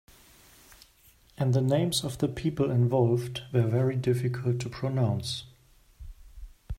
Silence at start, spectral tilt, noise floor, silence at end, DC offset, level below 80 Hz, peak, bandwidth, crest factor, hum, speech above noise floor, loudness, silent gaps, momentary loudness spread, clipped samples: 1.4 s; -6.5 dB/octave; -60 dBFS; 0 s; under 0.1%; -50 dBFS; -12 dBFS; 15.5 kHz; 18 dB; none; 33 dB; -28 LUFS; none; 7 LU; under 0.1%